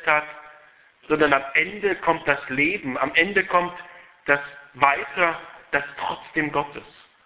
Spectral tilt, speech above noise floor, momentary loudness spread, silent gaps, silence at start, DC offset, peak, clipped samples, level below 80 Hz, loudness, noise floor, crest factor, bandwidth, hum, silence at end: -7.5 dB/octave; 30 dB; 15 LU; none; 0 s; under 0.1%; 0 dBFS; under 0.1%; -58 dBFS; -22 LUFS; -53 dBFS; 24 dB; 4 kHz; none; 0.35 s